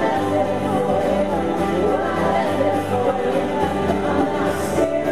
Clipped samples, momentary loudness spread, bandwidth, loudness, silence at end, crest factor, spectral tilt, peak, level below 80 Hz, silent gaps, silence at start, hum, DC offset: under 0.1%; 1 LU; 14 kHz; -20 LUFS; 0 s; 14 dB; -6.5 dB/octave; -6 dBFS; -42 dBFS; none; 0 s; none; 1%